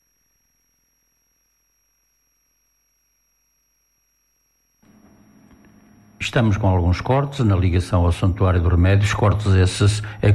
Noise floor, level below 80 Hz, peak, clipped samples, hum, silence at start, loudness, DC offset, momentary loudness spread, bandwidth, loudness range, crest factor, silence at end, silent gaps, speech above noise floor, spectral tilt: -66 dBFS; -40 dBFS; -6 dBFS; under 0.1%; none; 6.2 s; -19 LUFS; under 0.1%; 3 LU; 11.5 kHz; 8 LU; 14 dB; 0 s; none; 50 dB; -6.5 dB/octave